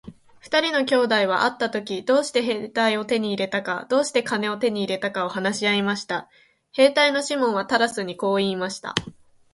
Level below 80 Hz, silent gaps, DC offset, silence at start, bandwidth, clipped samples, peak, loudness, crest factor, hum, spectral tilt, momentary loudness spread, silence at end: -62 dBFS; none; under 0.1%; 0.05 s; 11.5 kHz; under 0.1%; 0 dBFS; -22 LUFS; 22 dB; none; -3.5 dB/octave; 8 LU; 0.4 s